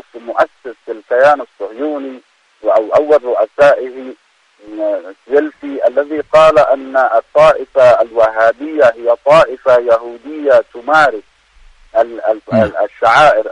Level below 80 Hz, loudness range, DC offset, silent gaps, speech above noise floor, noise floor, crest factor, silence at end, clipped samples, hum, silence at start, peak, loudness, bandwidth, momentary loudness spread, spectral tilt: -48 dBFS; 4 LU; under 0.1%; none; 33 dB; -45 dBFS; 12 dB; 0 s; under 0.1%; none; 0.15 s; 0 dBFS; -12 LUFS; 10 kHz; 14 LU; -5 dB/octave